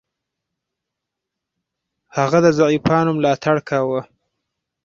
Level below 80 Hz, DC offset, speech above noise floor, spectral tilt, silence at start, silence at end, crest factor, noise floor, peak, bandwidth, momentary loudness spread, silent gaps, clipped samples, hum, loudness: -54 dBFS; under 0.1%; 66 dB; -6.5 dB/octave; 2.15 s; 0.8 s; 18 dB; -82 dBFS; -2 dBFS; 7.4 kHz; 8 LU; none; under 0.1%; none; -17 LUFS